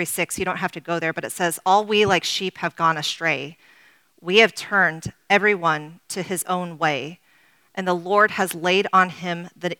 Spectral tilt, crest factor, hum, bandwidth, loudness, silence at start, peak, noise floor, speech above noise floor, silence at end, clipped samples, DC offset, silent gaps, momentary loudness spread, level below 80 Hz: -3.5 dB/octave; 22 dB; none; 19 kHz; -21 LUFS; 0 s; 0 dBFS; -59 dBFS; 37 dB; 0.05 s; under 0.1%; under 0.1%; none; 12 LU; -62 dBFS